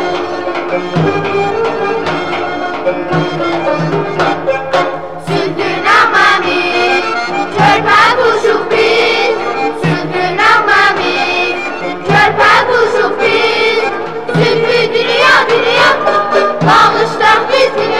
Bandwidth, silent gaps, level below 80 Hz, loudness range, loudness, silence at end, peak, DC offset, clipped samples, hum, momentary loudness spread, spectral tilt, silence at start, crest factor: 13.5 kHz; none; -46 dBFS; 5 LU; -11 LUFS; 0 s; -2 dBFS; 2%; under 0.1%; none; 9 LU; -4.5 dB/octave; 0 s; 10 dB